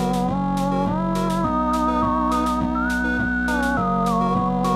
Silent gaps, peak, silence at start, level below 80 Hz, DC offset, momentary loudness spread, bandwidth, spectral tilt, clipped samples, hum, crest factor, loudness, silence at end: none; -10 dBFS; 0 s; -34 dBFS; under 0.1%; 2 LU; 15 kHz; -6.5 dB/octave; under 0.1%; none; 12 dB; -21 LUFS; 0 s